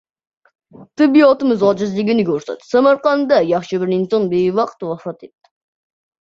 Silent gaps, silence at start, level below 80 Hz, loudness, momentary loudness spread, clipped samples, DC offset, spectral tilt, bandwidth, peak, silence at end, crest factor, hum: none; 0.8 s; -60 dBFS; -15 LUFS; 14 LU; under 0.1%; under 0.1%; -7 dB/octave; 7.6 kHz; -2 dBFS; 0.95 s; 16 dB; none